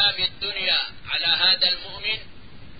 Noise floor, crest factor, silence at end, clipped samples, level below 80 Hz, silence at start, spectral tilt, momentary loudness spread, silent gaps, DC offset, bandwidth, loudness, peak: -44 dBFS; 18 dB; 0.05 s; under 0.1%; -52 dBFS; 0 s; -6 dB/octave; 10 LU; none; 1%; 5 kHz; -21 LUFS; -6 dBFS